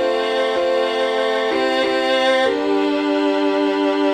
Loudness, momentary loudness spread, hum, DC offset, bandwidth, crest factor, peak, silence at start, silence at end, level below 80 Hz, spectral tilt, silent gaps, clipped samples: -18 LUFS; 3 LU; none; under 0.1%; 9.8 kHz; 12 dB; -4 dBFS; 0 s; 0 s; -58 dBFS; -3 dB/octave; none; under 0.1%